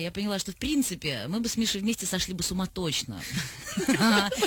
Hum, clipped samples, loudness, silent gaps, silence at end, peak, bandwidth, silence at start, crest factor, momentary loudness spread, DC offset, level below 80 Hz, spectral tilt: none; under 0.1%; -28 LUFS; none; 0 s; -12 dBFS; 19 kHz; 0 s; 16 dB; 10 LU; under 0.1%; -50 dBFS; -3.5 dB/octave